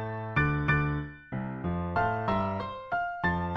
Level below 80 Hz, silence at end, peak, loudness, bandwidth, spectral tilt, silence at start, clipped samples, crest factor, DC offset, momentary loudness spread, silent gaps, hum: -44 dBFS; 0 s; -12 dBFS; -30 LUFS; 6 kHz; -9 dB/octave; 0 s; under 0.1%; 18 dB; under 0.1%; 9 LU; none; none